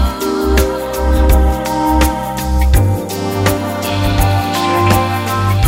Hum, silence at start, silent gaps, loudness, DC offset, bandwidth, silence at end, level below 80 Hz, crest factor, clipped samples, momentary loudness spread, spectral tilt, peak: none; 0 s; none; -14 LUFS; under 0.1%; 16.5 kHz; 0 s; -18 dBFS; 12 dB; under 0.1%; 6 LU; -5.5 dB/octave; 0 dBFS